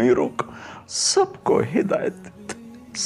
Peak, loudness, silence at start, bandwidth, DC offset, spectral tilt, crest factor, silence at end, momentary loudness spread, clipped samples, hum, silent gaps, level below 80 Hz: -6 dBFS; -22 LUFS; 0 s; 12 kHz; under 0.1%; -3.5 dB/octave; 16 dB; 0 s; 18 LU; under 0.1%; none; none; -58 dBFS